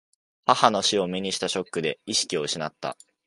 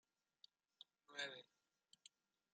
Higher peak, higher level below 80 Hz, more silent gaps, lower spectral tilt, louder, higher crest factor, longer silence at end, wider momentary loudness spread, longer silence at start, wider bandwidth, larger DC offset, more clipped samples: first, -2 dBFS vs -34 dBFS; first, -66 dBFS vs under -90 dBFS; neither; first, -2.5 dB/octave vs -0.5 dB/octave; first, -24 LUFS vs -52 LUFS; about the same, 24 dB vs 26 dB; about the same, 0.35 s vs 0.45 s; second, 10 LU vs 18 LU; second, 0.45 s vs 0.8 s; first, 11.5 kHz vs 9 kHz; neither; neither